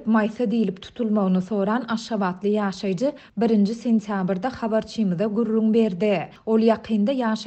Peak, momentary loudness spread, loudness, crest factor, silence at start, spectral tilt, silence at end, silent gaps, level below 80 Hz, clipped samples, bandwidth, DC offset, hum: -6 dBFS; 6 LU; -23 LUFS; 16 dB; 0 s; -7.5 dB/octave; 0 s; none; -60 dBFS; under 0.1%; 8.4 kHz; under 0.1%; none